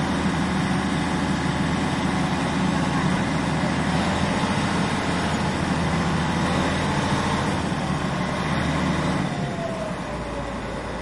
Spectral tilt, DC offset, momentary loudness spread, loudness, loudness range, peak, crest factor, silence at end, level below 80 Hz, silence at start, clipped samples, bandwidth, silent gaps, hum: -5.5 dB/octave; under 0.1%; 5 LU; -24 LUFS; 2 LU; -10 dBFS; 14 dB; 0 s; -40 dBFS; 0 s; under 0.1%; 11.5 kHz; none; none